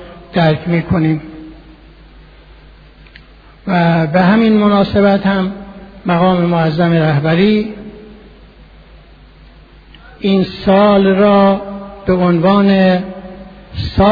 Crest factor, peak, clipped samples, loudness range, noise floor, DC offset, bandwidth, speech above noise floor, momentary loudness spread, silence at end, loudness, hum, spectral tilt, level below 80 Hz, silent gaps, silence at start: 14 dB; 0 dBFS; under 0.1%; 8 LU; -40 dBFS; under 0.1%; 5 kHz; 29 dB; 20 LU; 0 s; -12 LUFS; none; -9.5 dB/octave; -36 dBFS; none; 0 s